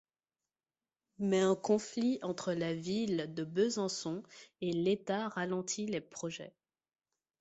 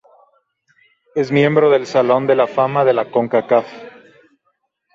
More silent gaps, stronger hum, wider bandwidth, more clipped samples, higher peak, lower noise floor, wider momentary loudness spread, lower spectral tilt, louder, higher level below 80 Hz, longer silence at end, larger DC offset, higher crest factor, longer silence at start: neither; neither; about the same, 8.2 kHz vs 7.6 kHz; neither; second, -18 dBFS vs -2 dBFS; first, under -90 dBFS vs -68 dBFS; about the same, 11 LU vs 10 LU; second, -5 dB/octave vs -7 dB/octave; second, -35 LUFS vs -15 LUFS; second, -76 dBFS vs -64 dBFS; second, 0.9 s vs 1.05 s; neither; about the same, 18 dB vs 16 dB; about the same, 1.2 s vs 1.15 s